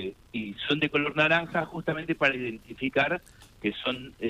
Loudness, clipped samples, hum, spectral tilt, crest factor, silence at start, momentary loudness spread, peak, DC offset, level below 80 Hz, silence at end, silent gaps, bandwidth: -28 LUFS; under 0.1%; none; -6 dB/octave; 20 dB; 0 s; 12 LU; -8 dBFS; under 0.1%; -58 dBFS; 0 s; none; 15 kHz